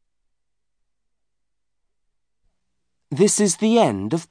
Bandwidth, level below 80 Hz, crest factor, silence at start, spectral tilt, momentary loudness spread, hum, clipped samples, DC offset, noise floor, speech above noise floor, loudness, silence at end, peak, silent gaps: 10.5 kHz; -68 dBFS; 20 dB; 3.1 s; -4.5 dB/octave; 8 LU; none; under 0.1%; under 0.1%; -83 dBFS; 64 dB; -18 LUFS; 0.05 s; -4 dBFS; none